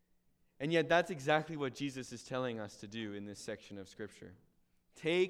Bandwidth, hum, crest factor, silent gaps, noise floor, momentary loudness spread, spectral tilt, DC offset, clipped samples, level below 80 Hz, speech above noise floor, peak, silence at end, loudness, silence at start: 14 kHz; none; 22 dB; none; -73 dBFS; 17 LU; -5 dB/octave; under 0.1%; under 0.1%; -72 dBFS; 36 dB; -16 dBFS; 0 s; -37 LUFS; 0.6 s